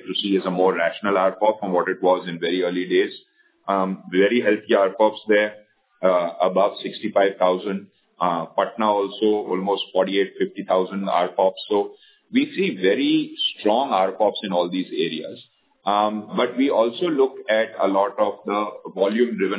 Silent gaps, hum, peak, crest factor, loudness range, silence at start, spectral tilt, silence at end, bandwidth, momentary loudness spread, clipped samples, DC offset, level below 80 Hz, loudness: none; none; -4 dBFS; 16 dB; 2 LU; 0.05 s; -9.5 dB/octave; 0 s; 4 kHz; 6 LU; under 0.1%; under 0.1%; -74 dBFS; -21 LUFS